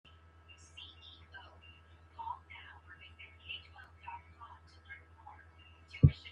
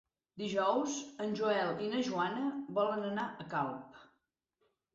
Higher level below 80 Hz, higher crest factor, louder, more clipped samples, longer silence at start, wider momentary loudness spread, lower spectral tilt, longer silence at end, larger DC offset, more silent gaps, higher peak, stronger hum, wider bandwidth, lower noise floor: first, -54 dBFS vs -78 dBFS; first, 30 dB vs 16 dB; second, -38 LUFS vs -35 LUFS; neither; first, 0.75 s vs 0.35 s; first, 14 LU vs 7 LU; first, -7.5 dB/octave vs -3.5 dB/octave; second, 0 s vs 0.9 s; neither; neither; first, -10 dBFS vs -20 dBFS; neither; about the same, 7.8 kHz vs 8 kHz; second, -59 dBFS vs -81 dBFS